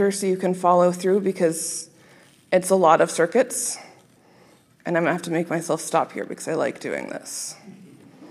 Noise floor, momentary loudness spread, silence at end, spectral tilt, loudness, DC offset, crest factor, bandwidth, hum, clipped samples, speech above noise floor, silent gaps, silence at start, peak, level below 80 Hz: -55 dBFS; 13 LU; 0 s; -4.5 dB/octave; -22 LUFS; under 0.1%; 20 dB; 15 kHz; none; under 0.1%; 33 dB; none; 0 s; -2 dBFS; -76 dBFS